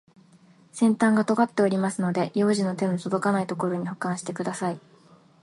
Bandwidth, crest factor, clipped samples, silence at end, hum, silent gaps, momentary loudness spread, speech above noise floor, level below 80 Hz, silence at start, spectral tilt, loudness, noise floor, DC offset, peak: 11.5 kHz; 18 dB; under 0.1%; 0.65 s; none; none; 9 LU; 31 dB; -70 dBFS; 0.75 s; -6 dB/octave; -25 LUFS; -55 dBFS; under 0.1%; -8 dBFS